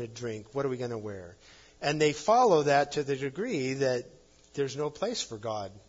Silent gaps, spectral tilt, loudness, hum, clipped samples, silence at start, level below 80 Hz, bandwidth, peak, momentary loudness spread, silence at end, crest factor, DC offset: none; -4.5 dB/octave; -29 LUFS; none; under 0.1%; 0 s; -64 dBFS; 7.8 kHz; -12 dBFS; 15 LU; 0.1 s; 18 dB; under 0.1%